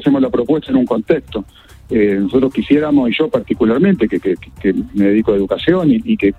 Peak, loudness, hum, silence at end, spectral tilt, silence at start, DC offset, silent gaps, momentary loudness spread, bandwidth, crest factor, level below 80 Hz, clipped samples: 0 dBFS; -15 LUFS; none; 0.05 s; -8.5 dB/octave; 0 s; under 0.1%; none; 6 LU; 4.5 kHz; 14 dB; -40 dBFS; under 0.1%